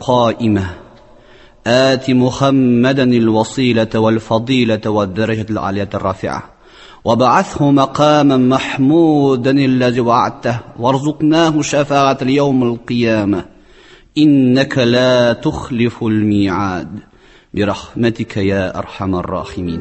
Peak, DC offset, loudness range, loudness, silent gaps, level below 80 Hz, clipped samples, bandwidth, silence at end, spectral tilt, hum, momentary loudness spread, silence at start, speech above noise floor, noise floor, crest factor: 0 dBFS; under 0.1%; 5 LU; -14 LUFS; none; -40 dBFS; under 0.1%; 8.4 kHz; 0 s; -6.5 dB/octave; none; 9 LU; 0 s; 30 dB; -43 dBFS; 14 dB